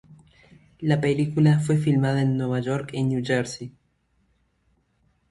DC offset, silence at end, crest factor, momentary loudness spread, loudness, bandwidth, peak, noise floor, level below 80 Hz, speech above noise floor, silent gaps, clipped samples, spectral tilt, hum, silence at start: under 0.1%; 1.6 s; 18 dB; 10 LU; -23 LUFS; 11.5 kHz; -8 dBFS; -68 dBFS; -58 dBFS; 46 dB; none; under 0.1%; -7 dB/octave; none; 0.1 s